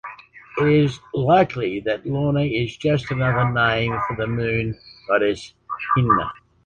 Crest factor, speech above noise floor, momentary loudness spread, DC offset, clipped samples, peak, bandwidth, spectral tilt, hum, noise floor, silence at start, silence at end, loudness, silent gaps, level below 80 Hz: 16 dB; 21 dB; 13 LU; under 0.1%; under 0.1%; -4 dBFS; 8.8 kHz; -7.5 dB/octave; none; -41 dBFS; 0.05 s; 0.3 s; -21 LUFS; none; -46 dBFS